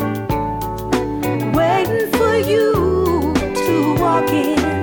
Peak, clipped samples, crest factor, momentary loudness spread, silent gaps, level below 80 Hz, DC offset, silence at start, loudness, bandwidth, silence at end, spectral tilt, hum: -4 dBFS; under 0.1%; 12 dB; 6 LU; none; -34 dBFS; under 0.1%; 0 s; -17 LUFS; 18 kHz; 0 s; -6 dB/octave; none